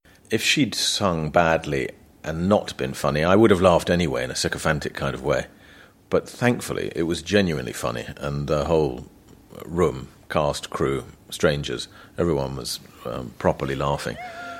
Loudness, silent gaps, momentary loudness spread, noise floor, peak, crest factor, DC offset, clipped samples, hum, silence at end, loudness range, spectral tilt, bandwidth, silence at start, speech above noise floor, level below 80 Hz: -23 LUFS; none; 12 LU; -50 dBFS; -2 dBFS; 22 dB; under 0.1%; under 0.1%; none; 0 s; 5 LU; -5 dB/octave; 16.5 kHz; 0.3 s; 27 dB; -44 dBFS